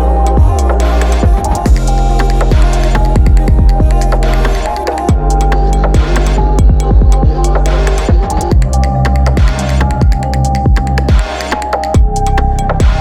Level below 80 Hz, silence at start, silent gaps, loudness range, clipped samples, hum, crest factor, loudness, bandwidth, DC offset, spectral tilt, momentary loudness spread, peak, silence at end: -10 dBFS; 0 s; none; 1 LU; under 0.1%; none; 8 dB; -12 LUFS; 11.5 kHz; under 0.1%; -6.5 dB/octave; 3 LU; 0 dBFS; 0 s